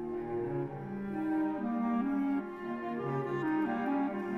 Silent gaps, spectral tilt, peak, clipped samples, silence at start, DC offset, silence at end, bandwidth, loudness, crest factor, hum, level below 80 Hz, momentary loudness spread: none; -9 dB/octave; -22 dBFS; under 0.1%; 0 s; under 0.1%; 0 s; 6.4 kHz; -34 LUFS; 12 dB; none; -64 dBFS; 6 LU